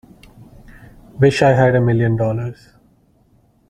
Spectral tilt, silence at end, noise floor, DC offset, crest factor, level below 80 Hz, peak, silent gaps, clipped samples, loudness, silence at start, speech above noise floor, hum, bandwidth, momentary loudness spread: -7.5 dB/octave; 1.15 s; -55 dBFS; under 0.1%; 16 dB; -44 dBFS; -2 dBFS; none; under 0.1%; -15 LUFS; 0.7 s; 41 dB; none; 10 kHz; 11 LU